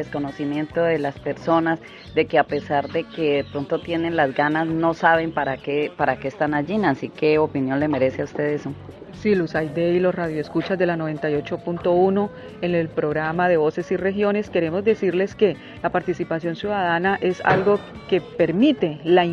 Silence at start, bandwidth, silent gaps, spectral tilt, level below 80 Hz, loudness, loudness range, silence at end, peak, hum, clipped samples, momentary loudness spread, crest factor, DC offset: 0 s; 7.4 kHz; none; -7.5 dB/octave; -54 dBFS; -22 LUFS; 2 LU; 0 s; -2 dBFS; none; under 0.1%; 8 LU; 20 dB; under 0.1%